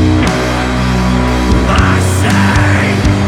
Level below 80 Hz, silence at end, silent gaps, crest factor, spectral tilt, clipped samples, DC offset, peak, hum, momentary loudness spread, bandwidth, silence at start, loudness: -18 dBFS; 0 s; none; 10 dB; -5.5 dB/octave; under 0.1%; under 0.1%; 0 dBFS; none; 4 LU; 14.5 kHz; 0 s; -11 LUFS